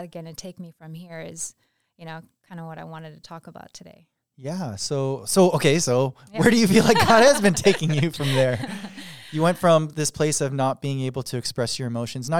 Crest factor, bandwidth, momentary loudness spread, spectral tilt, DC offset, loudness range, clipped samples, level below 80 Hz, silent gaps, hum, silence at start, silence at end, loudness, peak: 20 dB; 19 kHz; 23 LU; -4.5 dB/octave; 0.4%; 20 LU; under 0.1%; -54 dBFS; none; none; 0 s; 0 s; -21 LUFS; -2 dBFS